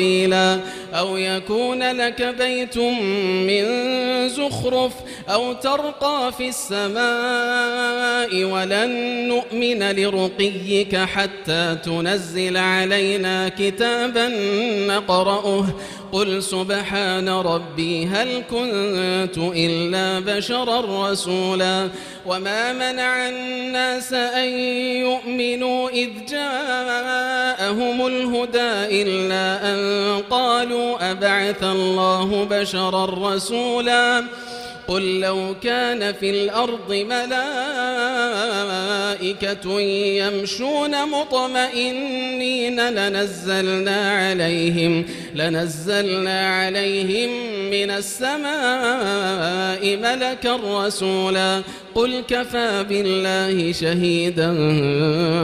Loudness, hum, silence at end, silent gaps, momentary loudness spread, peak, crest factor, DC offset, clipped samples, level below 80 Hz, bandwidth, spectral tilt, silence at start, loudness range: -20 LUFS; none; 0 s; none; 4 LU; -4 dBFS; 18 dB; under 0.1%; under 0.1%; -54 dBFS; 15.5 kHz; -4 dB/octave; 0 s; 2 LU